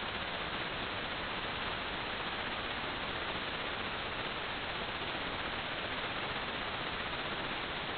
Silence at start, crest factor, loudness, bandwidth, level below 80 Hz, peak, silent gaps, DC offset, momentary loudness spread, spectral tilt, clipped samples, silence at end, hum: 0 s; 14 dB; -37 LUFS; 4.9 kHz; -54 dBFS; -24 dBFS; none; under 0.1%; 1 LU; -1 dB/octave; under 0.1%; 0 s; none